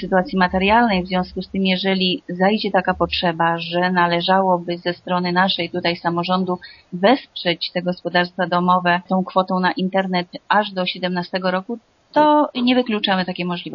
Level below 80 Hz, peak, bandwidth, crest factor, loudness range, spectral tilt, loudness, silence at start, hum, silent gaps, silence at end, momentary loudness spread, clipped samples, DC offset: -48 dBFS; -2 dBFS; 5.8 kHz; 18 dB; 2 LU; -3.5 dB/octave; -19 LUFS; 0 s; none; none; 0 s; 7 LU; under 0.1%; under 0.1%